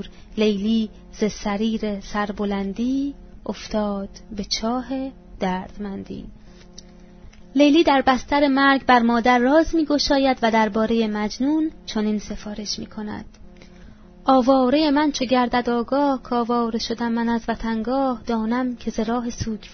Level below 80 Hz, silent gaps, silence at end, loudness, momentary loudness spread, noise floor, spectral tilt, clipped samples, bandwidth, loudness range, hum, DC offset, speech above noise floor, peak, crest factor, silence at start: -42 dBFS; none; 0 s; -21 LUFS; 15 LU; -44 dBFS; -5 dB/octave; under 0.1%; 6.6 kHz; 9 LU; none; under 0.1%; 23 dB; -2 dBFS; 18 dB; 0 s